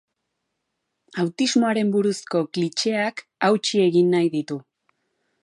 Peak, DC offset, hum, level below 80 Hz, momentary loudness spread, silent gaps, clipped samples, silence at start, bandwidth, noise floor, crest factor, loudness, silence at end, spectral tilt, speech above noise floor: -6 dBFS; under 0.1%; none; -76 dBFS; 9 LU; none; under 0.1%; 1.15 s; 11.5 kHz; -78 dBFS; 16 dB; -22 LUFS; 0.8 s; -5 dB/octave; 57 dB